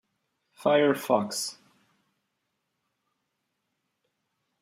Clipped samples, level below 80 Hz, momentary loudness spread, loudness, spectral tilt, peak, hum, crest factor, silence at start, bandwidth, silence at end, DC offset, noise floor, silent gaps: under 0.1%; -82 dBFS; 10 LU; -26 LUFS; -4 dB/octave; -8 dBFS; none; 24 dB; 0.6 s; 16 kHz; 3.1 s; under 0.1%; -80 dBFS; none